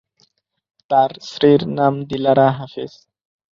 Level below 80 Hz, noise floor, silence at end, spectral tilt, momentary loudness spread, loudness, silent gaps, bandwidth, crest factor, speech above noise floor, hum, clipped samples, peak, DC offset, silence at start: -58 dBFS; -62 dBFS; 0.65 s; -7.5 dB/octave; 15 LU; -17 LUFS; none; 7.4 kHz; 16 dB; 46 dB; none; under 0.1%; -2 dBFS; under 0.1%; 0.9 s